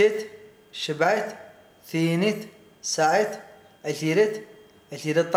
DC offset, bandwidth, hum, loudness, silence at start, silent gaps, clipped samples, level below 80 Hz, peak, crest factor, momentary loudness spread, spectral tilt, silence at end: under 0.1%; 16 kHz; none; -25 LUFS; 0 s; none; under 0.1%; -74 dBFS; -6 dBFS; 20 dB; 19 LU; -4.5 dB/octave; 0 s